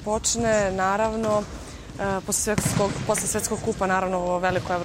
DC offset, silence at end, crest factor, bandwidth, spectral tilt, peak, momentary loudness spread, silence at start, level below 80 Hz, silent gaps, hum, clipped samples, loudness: under 0.1%; 0 s; 18 dB; 16 kHz; -4 dB/octave; -6 dBFS; 6 LU; 0 s; -42 dBFS; none; none; under 0.1%; -24 LUFS